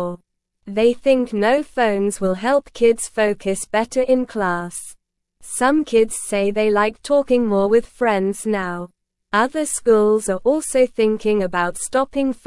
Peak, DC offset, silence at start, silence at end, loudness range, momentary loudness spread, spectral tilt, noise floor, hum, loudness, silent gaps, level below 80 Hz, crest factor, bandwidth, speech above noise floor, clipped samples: -4 dBFS; 0.2%; 0 s; 0.1 s; 2 LU; 7 LU; -4.5 dB/octave; -49 dBFS; none; -19 LUFS; none; -48 dBFS; 16 dB; 12 kHz; 31 dB; under 0.1%